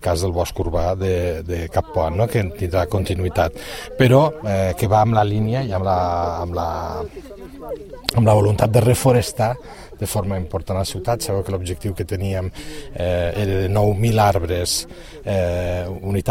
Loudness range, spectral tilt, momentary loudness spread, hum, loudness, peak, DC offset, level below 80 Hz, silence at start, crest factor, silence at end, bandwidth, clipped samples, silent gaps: 5 LU; -6 dB/octave; 15 LU; none; -20 LUFS; 0 dBFS; under 0.1%; -36 dBFS; 0 s; 20 dB; 0 s; 16.5 kHz; under 0.1%; none